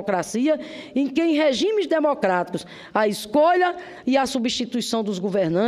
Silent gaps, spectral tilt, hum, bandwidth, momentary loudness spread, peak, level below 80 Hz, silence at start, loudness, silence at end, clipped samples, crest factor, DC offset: none; -4.5 dB/octave; none; 15 kHz; 7 LU; -6 dBFS; -60 dBFS; 0 s; -22 LUFS; 0 s; under 0.1%; 16 dB; under 0.1%